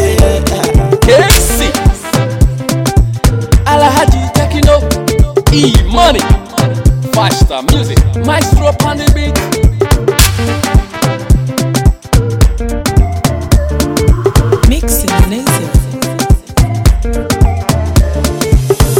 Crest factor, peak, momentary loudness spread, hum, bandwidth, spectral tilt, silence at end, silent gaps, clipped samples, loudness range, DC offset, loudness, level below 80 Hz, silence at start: 8 dB; 0 dBFS; 5 LU; none; 17.5 kHz; -5 dB/octave; 0 s; none; 0.5%; 2 LU; under 0.1%; -11 LUFS; -14 dBFS; 0 s